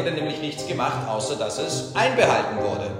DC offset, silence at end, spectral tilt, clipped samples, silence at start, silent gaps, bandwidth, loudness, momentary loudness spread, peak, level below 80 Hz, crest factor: under 0.1%; 0 s; -4 dB/octave; under 0.1%; 0 s; none; 16 kHz; -23 LUFS; 8 LU; -2 dBFS; -58 dBFS; 20 dB